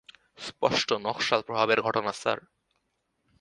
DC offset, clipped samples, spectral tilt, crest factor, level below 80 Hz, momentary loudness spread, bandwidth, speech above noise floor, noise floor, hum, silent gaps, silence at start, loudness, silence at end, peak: under 0.1%; under 0.1%; -3.5 dB/octave; 24 dB; -68 dBFS; 10 LU; 11.5 kHz; 50 dB; -77 dBFS; none; none; 0.4 s; -27 LUFS; 1 s; -6 dBFS